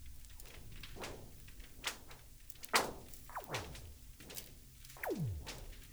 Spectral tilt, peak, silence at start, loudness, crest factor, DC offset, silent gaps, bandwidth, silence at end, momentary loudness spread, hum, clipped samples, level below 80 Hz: -3 dB/octave; -14 dBFS; 0 s; -43 LUFS; 30 dB; under 0.1%; none; over 20 kHz; 0 s; 20 LU; none; under 0.1%; -56 dBFS